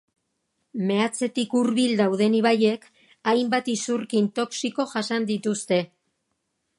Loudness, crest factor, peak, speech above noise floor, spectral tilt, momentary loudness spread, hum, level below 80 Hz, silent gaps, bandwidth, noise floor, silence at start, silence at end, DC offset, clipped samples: -24 LUFS; 18 dB; -6 dBFS; 53 dB; -4.5 dB/octave; 7 LU; none; -74 dBFS; none; 11.5 kHz; -76 dBFS; 0.75 s; 0.95 s; under 0.1%; under 0.1%